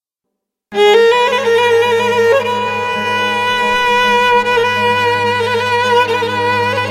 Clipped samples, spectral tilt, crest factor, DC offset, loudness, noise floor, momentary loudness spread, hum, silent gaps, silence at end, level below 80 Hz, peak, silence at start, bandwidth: under 0.1%; -3.5 dB/octave; 12 dB; under 0.1%; -12 LUFS; -77 dBFS; 5 LU; none; none; 0 s; -54 dBFS; 0 dBFS; 0.7 s; 15 kHz